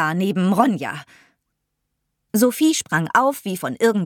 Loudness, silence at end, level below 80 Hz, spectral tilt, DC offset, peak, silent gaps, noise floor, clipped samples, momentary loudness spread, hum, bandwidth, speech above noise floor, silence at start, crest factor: -19 LUFS; 0 s; -68 dBFS; -5 dB/octave; under 0.1%; -2 dBFS; none; -76 dBFS; under 0.1%; 10 LU; none; 18.5 kHz; 57 dB; 0 s; 18 dB